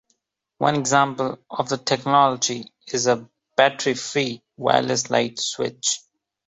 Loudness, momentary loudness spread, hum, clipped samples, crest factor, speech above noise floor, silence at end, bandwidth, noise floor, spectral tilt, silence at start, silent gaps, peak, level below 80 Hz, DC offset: -22 LUFS; 9 LU; none; under 0.1%; 20 dB; 49 dB; 0.5 s; 8.2 kHz; -71 dBFS; -3 dB/octave; 0.6 s; none; -2 dBFS; -66 dBFS; under 0.1%